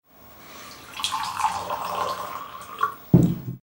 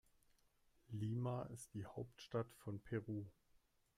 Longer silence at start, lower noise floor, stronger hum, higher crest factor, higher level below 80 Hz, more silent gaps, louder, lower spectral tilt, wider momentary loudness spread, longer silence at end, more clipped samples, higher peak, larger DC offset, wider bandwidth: second, 0.2 s vs 0.9 s; second, -47 dBFS vs -77 dBFS; neither; first, 24 dB vs 18 dB; first, -50 dBFS vs -74 dBFS; neither; first, -25 LUFS vs -48 LUFS; second, -5.5 dB/octave vs -7 dB/octave; first, 21 LU vs 9 LU; second, 0.05 s vs 0.65 s; neither; first, -2 dBFS vs -30 dBFS; neither; about the same, 16.5 kHz vs 15 kHz